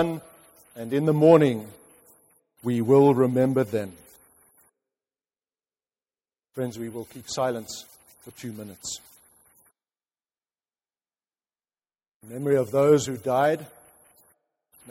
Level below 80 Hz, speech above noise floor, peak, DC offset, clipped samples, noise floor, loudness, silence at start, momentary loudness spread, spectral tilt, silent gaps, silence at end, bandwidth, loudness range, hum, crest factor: -66 dBFS; over 67 dB; -4 dBFS; under 0.1%; under 0.1%; under -90 dBFS; -23 LUFS; 0 s; 21 LU; -6.5 dB/octave; 12.14-12.20 s; 1.25 s; 16 kHz; 19 LU; none; 22 dB